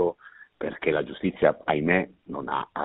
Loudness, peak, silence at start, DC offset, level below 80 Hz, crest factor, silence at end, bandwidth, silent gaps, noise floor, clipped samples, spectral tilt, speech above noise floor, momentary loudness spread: -27 LUFS; -4 dBFS; 0 s; under 0.1%; -58 dBFS; 22 dB; 0 s; 4.1 kHz; none; -50 dBFS; under 0.1%; -4.5 dB/octave; 25 dB; 12 LU